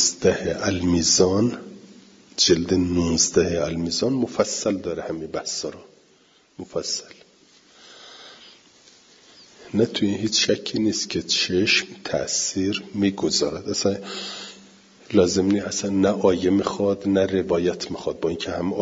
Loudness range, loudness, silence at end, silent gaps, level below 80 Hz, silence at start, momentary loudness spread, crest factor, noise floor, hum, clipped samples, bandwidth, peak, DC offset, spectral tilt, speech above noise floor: 12 LU; -22 LUFS; 0 s; none; -54 dBFS; 0 s; 12 LU; 20 dB; -58 dBFS; none; under 0.1%; 7.8 kHz; -4 dBFS; under 0.1%; -3.5 dB/octave; 35 dB